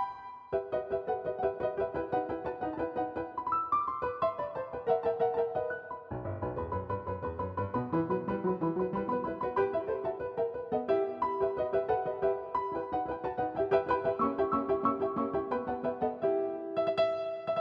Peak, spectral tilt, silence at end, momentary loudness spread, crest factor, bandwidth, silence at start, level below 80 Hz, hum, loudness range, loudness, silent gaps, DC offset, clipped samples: -14 dBFS; -9 dB/octave; 0 s; 7 LU; 18 dB; 5.6 kHz; 0 s; -58 dBFS; none; 3 LU; -33 LUFS; none; under 0.1%; under 0.1%